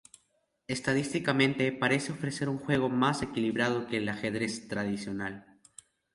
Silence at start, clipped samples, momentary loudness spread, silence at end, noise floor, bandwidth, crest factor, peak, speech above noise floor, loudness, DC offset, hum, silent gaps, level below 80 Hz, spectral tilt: 0.7 s; under 0.1%; 8 LU; 0.75 s; -74 dBFS; 11.5 kHz; 20 dB; -12 dBFS; 44 dB; -30 LUFS; under 0.1%; none; none; -62 dBFS; -5 dB/octave